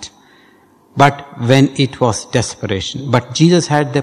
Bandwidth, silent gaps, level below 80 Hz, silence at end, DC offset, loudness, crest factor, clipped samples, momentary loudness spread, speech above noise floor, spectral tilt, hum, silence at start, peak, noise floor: 12.5 kHz; none; -44 dBFS; 0 s; under 0.1%; -14 LUFS; 16 dB; 0.5%; 9 LU; 35 dB; -5.5 dB/octave; none; 0 s; 0 dBFS; -49 dBFS